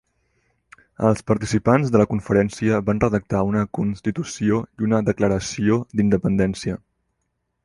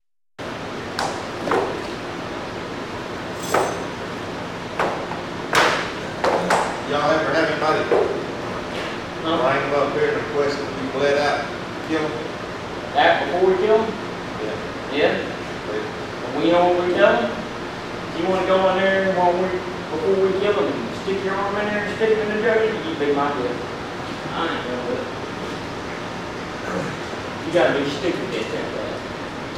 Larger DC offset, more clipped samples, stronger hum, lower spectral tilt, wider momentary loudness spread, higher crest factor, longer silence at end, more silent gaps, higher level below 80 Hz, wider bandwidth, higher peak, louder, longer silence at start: neither; neither; neither; first, -7 dB/octave vs -5 dB/octave; second, 6 LU vs 11 LU; about the same, 18 dB vs 20 dB; first, 0.9 s vs 0 s; neither; first, -44 dBFS vs -50 dBFS; second, 11.5 kHz vs 16 kHz; about the same, -2 dBFS vs -2 dBFS; about the same, -21 LUFS vs -22 LUFS; first, 1 s vs 0.4 s